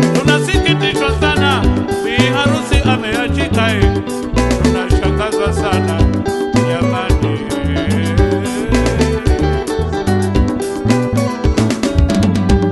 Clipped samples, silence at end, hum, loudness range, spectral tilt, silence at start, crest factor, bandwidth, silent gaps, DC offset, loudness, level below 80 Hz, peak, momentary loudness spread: under 0.1%; 0 s; none; 2 LU; -6 dB/octave; 0 s; 14 dB; 12 kHz; none; under 0.1%; -14 LUFS; -22 dBFS; 0 dBFS; 4 LU